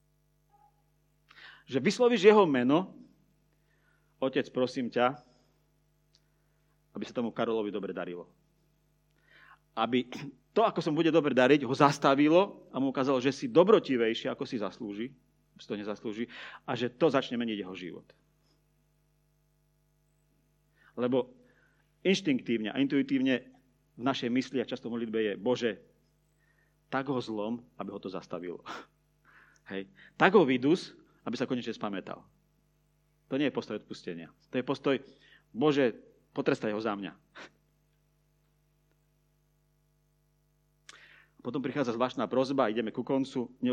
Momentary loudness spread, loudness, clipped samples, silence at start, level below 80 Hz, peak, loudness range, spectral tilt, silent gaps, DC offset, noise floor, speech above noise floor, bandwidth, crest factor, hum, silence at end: 19 LU; -30 LUFS; under 0.1%; 1.4 s; -74 dBFS; -6 dBFS; 12 LU; -6 dB/octave; none; under 0.1%; -71 dBFS; 42 dB; 10 kHz; 26 dB; 50 Hz at -65 dBFS; 0 s